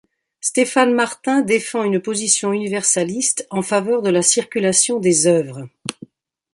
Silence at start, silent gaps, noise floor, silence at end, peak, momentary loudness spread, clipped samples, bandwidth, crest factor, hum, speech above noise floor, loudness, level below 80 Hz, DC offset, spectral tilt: 0.45 s; none; -43 dBFS; 0.6 s; 0 dBFS; 8 LU; under 0.1%; 11.5 kHz; 18 dB; none; 25 dB; -17 LUFS; -64 dBFS; under 0.1%; -3 dB/octave